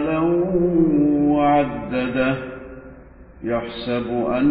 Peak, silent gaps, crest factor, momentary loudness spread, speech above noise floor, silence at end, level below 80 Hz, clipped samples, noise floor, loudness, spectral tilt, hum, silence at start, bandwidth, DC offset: -6 dBFS; none; 14 dB; 16 LU; 23 dB; 0 s; -44 dBFS; under 0.1%; -43 dBFS; -20 LUFS; -12 dB/octave; none; 0 s; 5 kHz; under 0.1%